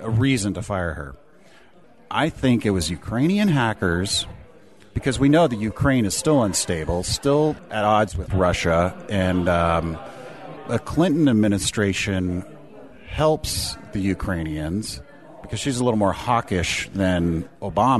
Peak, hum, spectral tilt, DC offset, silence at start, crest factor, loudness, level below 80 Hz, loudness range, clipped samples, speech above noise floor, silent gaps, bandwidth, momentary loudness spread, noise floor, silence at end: -6 dBFS; none; -5 dB/octave; 0.3%; 0 s; 16 dB; -22 LUFS; -40 dBFS; 4 LU; under 0.1%; 31 dB; none; 12.5 kHz; 10 LU; -52 dBFS; 0 s